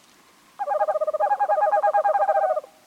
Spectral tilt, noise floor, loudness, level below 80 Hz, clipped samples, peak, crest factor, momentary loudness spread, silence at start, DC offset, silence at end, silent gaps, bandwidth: -2.5 dB/octave; -55 dBFS; -22 LUFS; -78 dBFS; under 0.1%; -10 dBFS; 14 dB; 5 LU; 0.6 s; under 0.1%; 0.25 s; none; 11.5 kHz